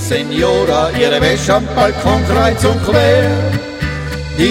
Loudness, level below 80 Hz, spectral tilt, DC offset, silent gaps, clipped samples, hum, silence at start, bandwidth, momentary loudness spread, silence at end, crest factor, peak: -13 LUFS; -26 dBFS; -5.5 dB/octave; under 0.1%; none; under 0.1%; none; 0 s; 16.5 kHz; 8 LU; 0 s; 12 dB; 0 dBFS